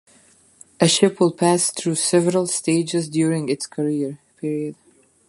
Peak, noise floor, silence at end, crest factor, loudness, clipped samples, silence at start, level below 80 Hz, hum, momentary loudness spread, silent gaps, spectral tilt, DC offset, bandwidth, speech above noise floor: -2 dBFS; -54 dBFS; 0.55 s; 20 dB; -20 LUFS; under 0.1%; 0.8 s; -66 dBFS; none; 11 LU; none; -4.5 dB/octave; under 0.1%; 11.5 kHz; 34 dB